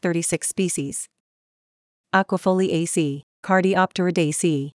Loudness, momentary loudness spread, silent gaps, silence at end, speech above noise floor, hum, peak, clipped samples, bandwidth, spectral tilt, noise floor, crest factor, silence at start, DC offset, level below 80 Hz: -22 LUFS; 8 LU; 1.20-2.04 s, 3.23-3.43 s; 0.05 s; over 69 dB; none; -4 dBFS; under 0.1%; 12 kHz; -4.5 dB/octave; under -90 dBFS; 20 dB; 0.05 s; under 0.1%; -68 dBFS